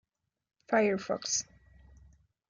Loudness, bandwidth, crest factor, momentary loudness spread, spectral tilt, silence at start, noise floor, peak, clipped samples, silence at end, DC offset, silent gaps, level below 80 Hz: -30 LUFS; 10 kHz; 20 dB; 6 LU; -3 dB/octave; 0.7 s; -62 dBFS; -16 dBFS; under 0.1%; 1.1 s; under 0.1%; none; -64 dBFS